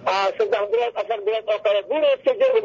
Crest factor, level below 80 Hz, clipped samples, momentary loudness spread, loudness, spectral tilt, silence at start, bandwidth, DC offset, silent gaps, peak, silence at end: 12 dB; -70 dBFS; under 0.1%; 4 LU; -21 LUFS; -3 dB/octave; 0 s; 7.6 kHz; under 0.1%; none; -8 dBFS; 0 s